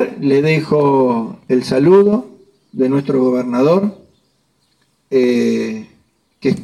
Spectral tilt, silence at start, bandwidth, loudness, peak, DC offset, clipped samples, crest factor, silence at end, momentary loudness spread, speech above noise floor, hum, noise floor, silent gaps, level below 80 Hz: -7.5 dB/octave; 0 s; 12 kHz; -15 LUFS; -2 dBFS; under 0.1%; under 0.1%; 14 dB; 0 s; 10 LU; 48 dB; none; -61 dBFS; none; -58 dBFS